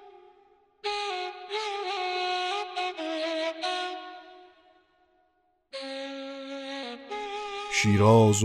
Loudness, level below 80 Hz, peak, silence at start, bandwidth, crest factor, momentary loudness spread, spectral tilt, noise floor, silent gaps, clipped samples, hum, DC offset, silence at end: -29 LUFS; -66 dBFS; -8 dBFS; 0 s; 12.5 kHz; 22 dB; 16 LU; -5 dB/octave; -71 dBFS; none; under 0.1%; none; under 0.1%; 0 s